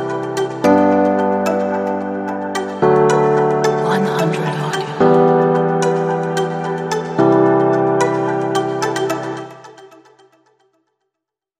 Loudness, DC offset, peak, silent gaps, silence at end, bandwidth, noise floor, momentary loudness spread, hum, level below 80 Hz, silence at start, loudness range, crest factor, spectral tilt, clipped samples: -16 LUFS; under 0.1%; -2 dBFS; none; 1.75 s; 15.5 kHz; -82 dBFS; 9 LU; none; -58 dBFS; 0 s; 5 LU; 16 dB; -6.5 dB/octave; under 0.1%